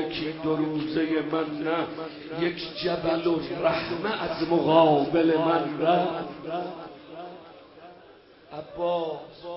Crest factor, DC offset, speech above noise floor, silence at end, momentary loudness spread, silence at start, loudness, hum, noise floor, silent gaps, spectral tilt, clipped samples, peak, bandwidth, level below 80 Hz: 20 dB; under 0.1%; 26 dB; 0 s; 20 LU; 0 s; -26 LUFS; none; -52 dBFS; none; -10 dB/octave; under 0.1%; -6 dBFS; 5.8 kHz; -60 dBFS